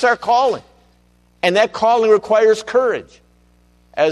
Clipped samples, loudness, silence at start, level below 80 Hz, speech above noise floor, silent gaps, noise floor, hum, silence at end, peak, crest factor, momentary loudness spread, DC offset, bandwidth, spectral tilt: under 0.1%; -16 LUFS; 0 s; -56 dBFS; 40 dB; none; -55 dBFS; 60 Hz at -50 dBFS; 0 s; -2 dBFS; 14 dB; 10 LU; under 0.1%; 11.5 kHz; -4 dB/octave